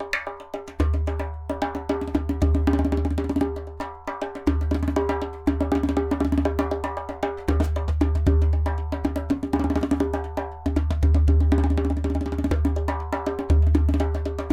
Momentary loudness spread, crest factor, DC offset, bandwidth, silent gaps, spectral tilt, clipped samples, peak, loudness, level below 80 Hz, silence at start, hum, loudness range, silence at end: 9 LU; 16 dB; under 0.1%; 8.4 kHz; none; -8.5 dB/octave; under 0.1%; -8 dBFS; -24 LUFS; -26 dBFS; 0 s; none; 3 LU; 0 s